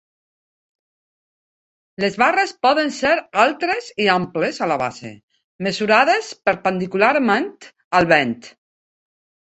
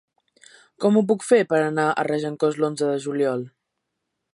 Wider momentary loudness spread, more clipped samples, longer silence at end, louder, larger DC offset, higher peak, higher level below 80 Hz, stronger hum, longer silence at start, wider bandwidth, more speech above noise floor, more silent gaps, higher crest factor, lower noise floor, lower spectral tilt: first, 10 LU vs 6 LU; neither; first, 1.05 s vs 0.85 s; first, -18 LUFS vs -22 LUFS; neither; first, 0 dBFS vs -4 dBFS; first, -60 dBFS vs -76 dBFS; neither; first, 2 s vs 0.8 s; second, 8.4 kHz vs 11.5 kHz; first, over 72 dB vs 58 dB; first, 5.23-5.28 s, 5.44-5.59 s, 7.84-7.91 s vs none; about the same, 20 dB vs 18 dB; first, under -90 dBFS vs -79 dBFS; second, -4.5 dB/octave vs -6 dB/octave